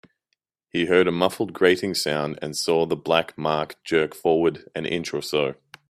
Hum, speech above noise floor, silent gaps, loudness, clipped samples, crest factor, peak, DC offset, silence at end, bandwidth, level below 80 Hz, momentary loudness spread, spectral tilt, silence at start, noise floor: none; 54 dB; none; -23 LUFS; under 0.1%; 20 dB; -2 dBFS; under 0.1%; 0.35 s; 15.5 kHz; -62 dBFS; 8 LU; -4.5 dB/octave; 0.75 s; -77 dBFS